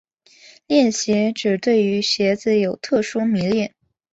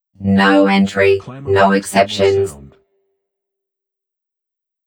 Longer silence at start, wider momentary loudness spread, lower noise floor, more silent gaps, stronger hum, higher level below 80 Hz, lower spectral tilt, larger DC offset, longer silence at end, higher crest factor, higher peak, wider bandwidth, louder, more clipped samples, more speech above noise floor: first, 0.7 s vs 0.2 s; second, 4 LU vs 7 LU; second, -50 dBFS vs -76 dBFS; neither; neither; second, -60 dBFS vs -54 dBFS; about the same, -4.5 dB/octave vs -5.5 dB/octave; neither; second, 0.45 s vs 2.3 s; about the same, 16 dB vs 16 dB; about the same, -4 dBFS vs -2 dBFS; second, 8 kHz vs 17 kHz; second, -19 LUFS vs -14 LUFS; neither; second, 31 dB vs 63 dB